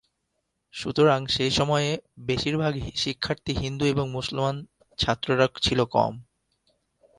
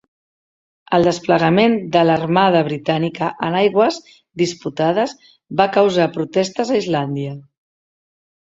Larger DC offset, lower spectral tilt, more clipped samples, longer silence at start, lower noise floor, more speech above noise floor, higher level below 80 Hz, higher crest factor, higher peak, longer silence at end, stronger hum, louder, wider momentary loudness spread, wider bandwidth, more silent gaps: neither; about the same, -5 dB/octave vs -6 dB/octave; neither; second, 0.75 s vs 0.9 s; second, -77 dBFS vs under -90 dBFS; second, 53 dB vs over 73 dB; first, -48 dBFS vs -58 dBFS; about the same, 20 dB vs 18 dB; second, -6 dBFS vs 0 dBFS; second, 0.95 s vs 1.15 s; neither; second, -25 LUFS vs -17 LUFS; about the same, 9 LU vs 10 LU; first, 11.5 kHz vs 8 kHz; neither